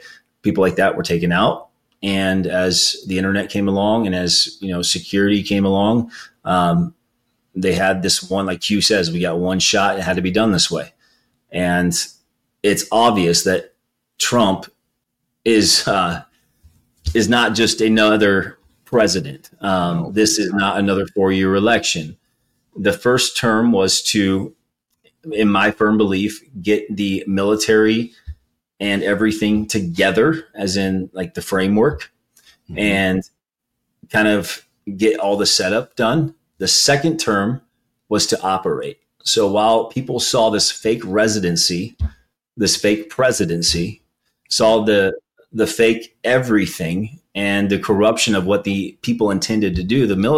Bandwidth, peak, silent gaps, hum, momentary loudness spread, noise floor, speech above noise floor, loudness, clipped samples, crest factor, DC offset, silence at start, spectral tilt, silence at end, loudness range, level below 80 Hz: 16 kHz; -2 dBFS; none; none; 10 LU; -77 dBFS; 61 dB; -17 LUFS; under 0.1%; 16 dB; under 0.1%; 0.05 s; -4 dB/octave; 0 s; 2 LU; -44 dBFS